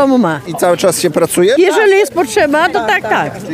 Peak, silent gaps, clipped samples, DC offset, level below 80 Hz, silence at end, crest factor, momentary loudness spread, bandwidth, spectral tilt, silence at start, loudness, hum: 0 dBFS; none; under 0.1%; under 0.1%; -50 dBFS; 0 s; 10 dB; 6 LU; 16 kHz; -4 dB/octave; 0 s; -11 LUFS; none